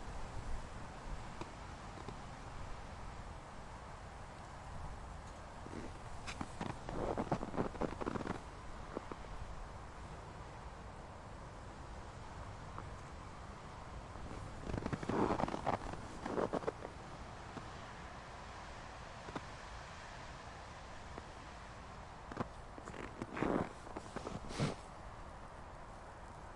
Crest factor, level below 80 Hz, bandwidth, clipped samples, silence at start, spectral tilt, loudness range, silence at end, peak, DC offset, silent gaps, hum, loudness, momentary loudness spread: 24 dB; -54 dBFS; 11.5 kHz; under 0.1%; 0 s; -6 dB/octave; 10 LU; 0 s; -20 dBFS; under 0.1%; none; none; -46 LUFS; 12 LU